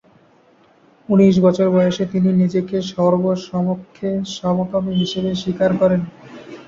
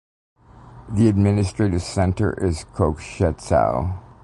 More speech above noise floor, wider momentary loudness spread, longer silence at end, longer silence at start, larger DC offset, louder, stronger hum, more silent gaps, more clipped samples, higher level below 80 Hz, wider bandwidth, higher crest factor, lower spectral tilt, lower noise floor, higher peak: first, 36 dB vs 24 dB; about the same, 9 LU vs 7 LU; second, 0.05 s vs 0.25 s; first, 1.1 s vs 0.65 s; neither; first, -18 LUFS vs -21 LUFS; neither; neither; neither; second, -52 dBFS vs -34 dBFS; second, 7.4 kHz vs 11.5 kHz; about the same, 16 dB vs 16 dB; about the same, -7.5 dB/octave vs -7.5 dB/octave; first, -53 dBFS vs -44 dBFS; about the same, -2 dBFS vs -4 dBFS